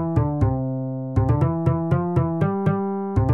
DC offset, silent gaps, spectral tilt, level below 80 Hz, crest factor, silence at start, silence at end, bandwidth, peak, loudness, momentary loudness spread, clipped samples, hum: 0.1%; none; -11 dB/octave; -36 dBFS; 12 dB; 0 s; 0 s; 4 kHz; -8 dBFS; -22 LUFS; 5 LU; under 0.1%; none